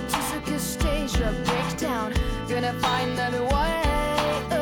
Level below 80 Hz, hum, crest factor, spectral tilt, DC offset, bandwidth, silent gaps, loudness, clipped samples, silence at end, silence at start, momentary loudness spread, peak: -32 dBFS; none; 12 dB; -4.5 dB/octave; under 0.1%; 19.5 kHz; none; -25 LUFS; under 0.1%; 0 s; 0 s; 4 LU; -12 dBFS